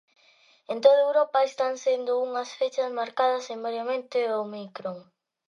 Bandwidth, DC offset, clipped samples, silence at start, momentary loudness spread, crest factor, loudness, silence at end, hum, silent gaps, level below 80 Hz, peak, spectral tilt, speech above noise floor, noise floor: 7.4 kHz; under 0.1%; under 0.1%; 0.7 s; 15 LU; 20 dB; -26 LUFS; 0.45 s; none; none; -86 dBFS; -6 dBFS; -3.5 dB/octave; 35 dB; -60 dBFS